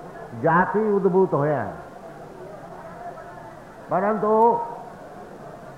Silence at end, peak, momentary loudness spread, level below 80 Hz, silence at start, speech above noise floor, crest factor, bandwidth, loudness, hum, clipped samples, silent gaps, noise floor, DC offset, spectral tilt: 0 s; -8 dBFS; 21 LU; -56 dBFS; 0 s; 21 dB; 16 dB; 11 kHz; -21 LUFS; none; under 0.1%; none; -41 dBFS; under 0.1%; -9 dB/octave